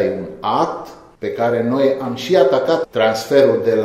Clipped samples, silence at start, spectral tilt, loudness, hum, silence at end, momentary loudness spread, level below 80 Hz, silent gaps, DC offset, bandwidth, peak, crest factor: under 0.1%; 0 s; -5.5 dB/octave; -17 LUFS; none; 0 s; 12 LU; -56 dBFS; none; under 0.1%; 15 kHz; 0 dBFS; 16 dB